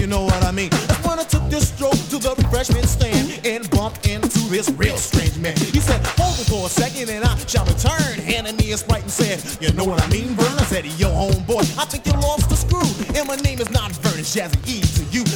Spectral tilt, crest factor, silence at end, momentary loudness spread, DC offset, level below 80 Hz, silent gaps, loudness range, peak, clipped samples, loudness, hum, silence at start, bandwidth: -4.5 dB/octave; 16 dB; 0 s; 4 LU; under 0.1%; -26 dBFS; none; 1 LU; -2 dBFS; under 0.1%; -19 LUFS; none; 0 s; 19.5 kHz